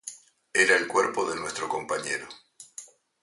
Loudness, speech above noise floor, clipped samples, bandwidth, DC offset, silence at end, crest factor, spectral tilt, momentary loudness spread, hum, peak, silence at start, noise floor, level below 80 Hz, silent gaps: -26 LUFS; 22 dB; under 0.1%; 11.5 kHz; under 0.1%; 0.35 s; 22 dB; -1.5 dB/octave; 23 LU; none; -6 dBFS; 0.05 s; -48 dBFS; -70 dBFS; none